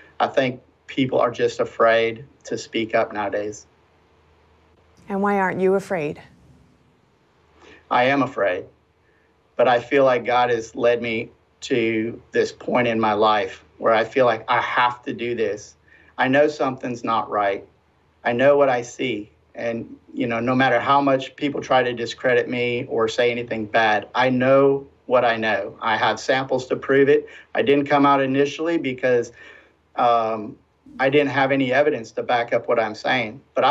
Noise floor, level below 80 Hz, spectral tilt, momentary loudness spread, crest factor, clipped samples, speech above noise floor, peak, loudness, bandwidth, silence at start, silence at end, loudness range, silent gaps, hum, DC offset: -60 dBFS; -64 dBFS; -5.5 dB/octave; 11 LU; 16 dB; under 0.1%; 40 dB; -6 dBFS; -21 LUFS; 8.6 kHz; 0.2 s; 0 s; 6 LU; none; none; under 0.1%